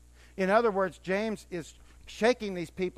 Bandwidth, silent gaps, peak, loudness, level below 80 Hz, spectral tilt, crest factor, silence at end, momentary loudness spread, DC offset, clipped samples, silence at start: 14.5 kHz; none; -10 dBFS; -29 LUFS; -56 dBFS; -5.5 dB/octave; 20 dB; 0.05 s; 19 LU; under 0.1%; under 0.1%; 0.35 s